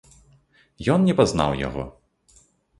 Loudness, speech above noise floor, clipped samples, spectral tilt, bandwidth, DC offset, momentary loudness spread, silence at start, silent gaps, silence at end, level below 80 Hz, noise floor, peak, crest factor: -22 LUFS; 38 dB; under 0.1%; -6.5 dB/octave; 11.5 kHz; under 0.1%; 14 LU; 0.8 s; none; 0.9 s; -44 dBFS; -58 dBFS; -2 dBFS; 22 dB